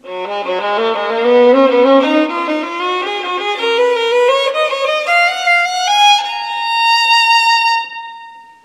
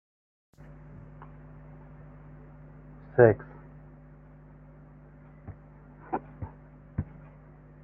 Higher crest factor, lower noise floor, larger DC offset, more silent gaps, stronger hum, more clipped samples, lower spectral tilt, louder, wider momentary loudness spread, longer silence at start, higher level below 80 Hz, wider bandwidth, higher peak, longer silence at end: second, 14 dB vs 28 dB; second, -36 dBFS vs -51 dBFS; neither; neither; neither; neither; second, -1 dB/octave vs -12 dB/octave; first, -12 LUFS vs -27 LUFS; second, 9 LU vs 25 LU; second, 0.05 s vs 3.15 s; second, -70 dBFS vs -54 dBFS; first, 14.5 kHz vs 3 kHz; first, 0 dBFS vs -6 dBFS; second, 0.2 s vs 0.8 s